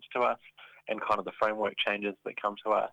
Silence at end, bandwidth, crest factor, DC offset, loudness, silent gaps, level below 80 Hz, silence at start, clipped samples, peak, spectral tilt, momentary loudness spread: 0 s; 9.8 kHz; 20 dB; under 0.1%; -31 LUFS; none; -72 dBFS; 0 s; under 0.1%; -12 dBFS; -5 dB/octave; 8 LU